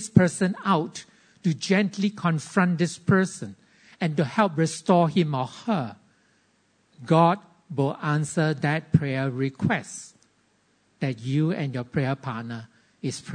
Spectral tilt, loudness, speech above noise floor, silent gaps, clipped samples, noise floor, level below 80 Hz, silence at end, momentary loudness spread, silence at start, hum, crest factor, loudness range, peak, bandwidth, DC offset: -6 dB/octave; -25 LUFS; 42 dB; none; under 0.1%; -66 dBFS; -60 dBFS; 0 s; 14 LU; 0 s; none; 24 dB; 5 LU; -2 dBFS; 9.6 kHz; under 0.1%